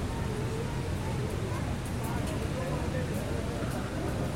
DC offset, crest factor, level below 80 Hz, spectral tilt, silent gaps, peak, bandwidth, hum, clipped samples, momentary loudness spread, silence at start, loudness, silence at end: 0.2%; 12 dB; -40 dBFS; -6 dB/octave; none; -20 dBFS; 16 kHz; none; under 0.1%; 1 LU; 0 s; -33 LUFS; 0 s